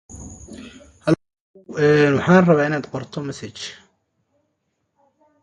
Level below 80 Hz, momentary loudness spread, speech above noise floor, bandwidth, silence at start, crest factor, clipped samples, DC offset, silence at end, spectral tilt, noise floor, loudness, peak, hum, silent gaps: -52 dBFS; 24 LU; 55 dB; 10.5 kHz; 0.1 s; 20 dB; under 0.1%; under 0.1%; 1.7 s; -6.5 dB/octave; -72 dBFS; -18 LUFS; -2 dBFS; none; 1.40-1.54 s